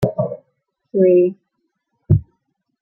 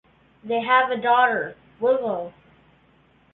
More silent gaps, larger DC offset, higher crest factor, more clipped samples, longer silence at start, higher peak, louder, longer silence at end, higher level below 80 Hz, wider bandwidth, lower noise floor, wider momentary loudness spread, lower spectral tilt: neither; neither; about the same, 18 dB vs 18 dB; neither; second, 0 s vs 0.45 s; first, -2 dBFS vs -6 dBFS; first, -17 LUFS vs -21 LUFS; second, 0.6 s vs 1.05 s; first, -44 dBFS vs -66 dBFS; about the same, 4 kHz vs 4.2 kHz; first, -72 dBFS vs -58 dBFS; about the same, 12 LU vs 13 LU; first, -11 dB/octave vs -8 dB/octave